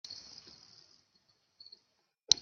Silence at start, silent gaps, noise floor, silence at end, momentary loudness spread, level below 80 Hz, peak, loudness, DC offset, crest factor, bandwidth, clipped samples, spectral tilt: 0.1 s; none; -77 dBFS; 2.3 s; 18 LU; -74 dBFS; -2 dBFS; -34 LUFS; under 0.1%; 38 dB; 7 kHz; under 0.1%; 1.5 dB/octave